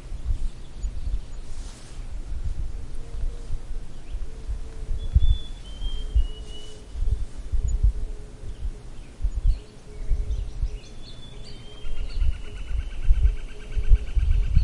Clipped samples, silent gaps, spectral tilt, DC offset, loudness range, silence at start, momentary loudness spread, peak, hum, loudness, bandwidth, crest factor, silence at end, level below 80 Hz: under 0.1%; none; -6 dB/octave; under 0.1%; 8 LU; 0 s; 16 LU; -4 dBFS; none; -31 LUFS; 10.5 kHz; 20 dB; 0 s; -26 dBFS